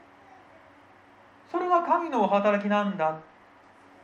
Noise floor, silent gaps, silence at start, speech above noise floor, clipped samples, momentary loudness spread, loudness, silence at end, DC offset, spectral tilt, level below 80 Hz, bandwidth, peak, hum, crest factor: -55 dBFS; none; 1.5 s; 30 dB; under 0.1%; 9 LU; -25 LUFS; 0.8 s; under 0.1%; -7 dB/octave; -74 dBFS; 7.2 kHz; -10 dBFS; none; 18 dB